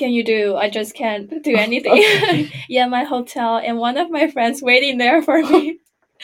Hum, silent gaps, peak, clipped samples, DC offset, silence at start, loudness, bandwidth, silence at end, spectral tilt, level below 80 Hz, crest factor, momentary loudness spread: none; none; 0 dBFS; under 0.1%; under 0.1%; 0 s; -16 LUFS; 17 kHz; 0 s; -4.5 dB/octave; -64 dBFS; 16 dB; 10 LU